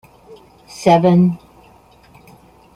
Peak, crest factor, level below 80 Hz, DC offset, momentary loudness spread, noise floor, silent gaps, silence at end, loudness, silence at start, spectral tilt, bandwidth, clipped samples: -2 dBFS; 16 dB; -54 dBFS; under 0.1%; 21 LU; -48 dBFS; none; 1.4 s; -14 LUFS; 0.8 s; -7.5 dB/octave; 11 kHz; under 0.1%